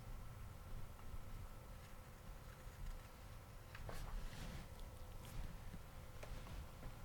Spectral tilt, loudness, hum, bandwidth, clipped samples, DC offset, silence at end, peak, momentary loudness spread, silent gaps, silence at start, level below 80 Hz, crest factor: -5 dB/octave; -56 LUFS; none; 19 kHz; under 0.1%; under 0.1%; 0 s; -36 dBFS; 5 LU; none; 0 s; -54 dBFS; 14 dB